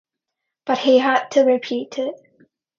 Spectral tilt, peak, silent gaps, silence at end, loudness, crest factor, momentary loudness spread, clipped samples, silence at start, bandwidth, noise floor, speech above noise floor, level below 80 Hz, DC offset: -3.5 dB/octave; -4 dBFS; none; 0.65 s; -19 LUFS; 18 dB; 12 LU; under 0.1%; 0.65 s; 7.2 kHz; -81 dBFS; 64 dB; -72 dBFS; under 0.1%